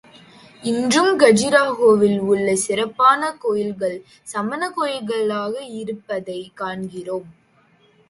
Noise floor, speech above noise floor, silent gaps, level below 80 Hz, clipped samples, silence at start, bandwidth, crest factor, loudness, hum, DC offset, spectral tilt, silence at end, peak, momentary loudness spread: -57 dBFS; 38 dB; none; -60 dBFS; under 0.1%; 0.6 s; 11.5 kHz; 20 dB; -19 LUFS; none; under 0.1%; -4 dB/octave; 0.8 s; 0 dBFS; 15 LU